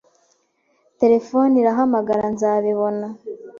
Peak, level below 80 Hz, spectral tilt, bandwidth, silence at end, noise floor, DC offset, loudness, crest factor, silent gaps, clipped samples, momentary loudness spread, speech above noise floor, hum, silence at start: -4 dBFS; -62 dBFS; -7.5 dB/octave; 7.4 kHz; 0 s; -65 dBFS; under 0.1%; -18 LUFS; 14 dB; none; under 0.1%; 13 LU; 47 dB; none; 1 s